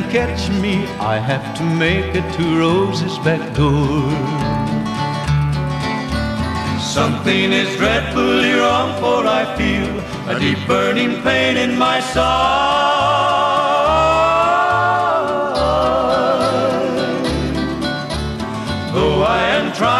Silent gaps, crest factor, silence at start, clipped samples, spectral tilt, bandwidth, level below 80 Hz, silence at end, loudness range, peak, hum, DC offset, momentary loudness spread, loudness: none; 16 dB; 0 s; under 0.1%; -5.5 dB/octave; 13.5 kHz; -34 dBFS; 0 s; 4 LU; 0 dBFS; none; under 0.1%; 6 LU; -16 LUFS